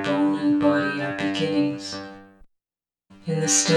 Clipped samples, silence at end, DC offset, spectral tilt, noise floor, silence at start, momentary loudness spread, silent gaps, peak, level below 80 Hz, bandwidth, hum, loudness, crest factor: under 0.1%; 0 s; under 0.1%; -3.5 dB/octave; under -90 dBFS; 0 s; 14 LU; none; -6 dBFS; -62 dBFS; 13 kHz; none; -23 LUFS; 18 dB